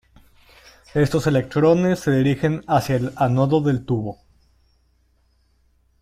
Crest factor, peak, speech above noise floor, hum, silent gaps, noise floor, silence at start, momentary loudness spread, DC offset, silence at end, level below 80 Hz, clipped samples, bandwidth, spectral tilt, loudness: 16 dB; -6 dBFS; 43 dB; none; none; -62 dBFS; 0.95 s; 7 LU; under 0.1%; 1.85 s; -50 dBFS; under 0.1%; 15.5 kHz; -7.5 dB/octave; -20 LUFS